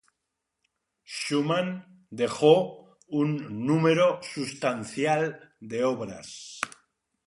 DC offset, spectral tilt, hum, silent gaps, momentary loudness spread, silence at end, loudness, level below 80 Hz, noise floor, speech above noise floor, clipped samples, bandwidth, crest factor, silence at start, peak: under 0.1%; -5.5 dB/octave; none; none; 17 LU; 0.6 s; -27 LUFS; -70 dBFS; -83 dBFS; 57 dB; under 0.1%; 11.5 kHz; 22 dB; 1.1 s; -6 dBFS